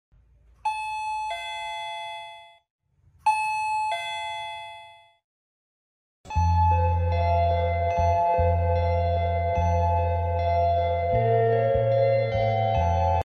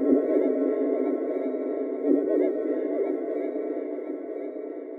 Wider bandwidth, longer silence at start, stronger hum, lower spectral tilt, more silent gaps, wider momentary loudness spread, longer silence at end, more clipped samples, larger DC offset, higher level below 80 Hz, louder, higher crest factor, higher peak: first, 10 kHz vs 3.9 kHz; first, 0.65 s vs 0 s; neither; second, -6.5 dB/octave vs -9 dB/octave; first, 2.70-2.79 s, 5.24-6.24 s vs none; about the same, 11 LU vs 11 LU; about the same, 0.05 s vs 0 s; neither; neither; first, -36 dBFS vs -78 dBFS; first, -24 LUFS vs -27 LUFS; about the same, 14 dB vs 18 dB; about the same, -12 dBFS vs -10 dBFS